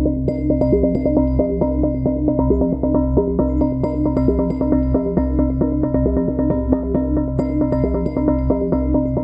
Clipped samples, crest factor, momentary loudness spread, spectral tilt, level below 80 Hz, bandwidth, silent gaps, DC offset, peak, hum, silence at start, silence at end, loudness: under 0.1%; 16 dB; 2 LU; -12.5 dB/octave; -26 dBFS; 5.2 kHz; none; under 0.1%; -2 dBFS; none; 0 s; 0 s; -18 LUFS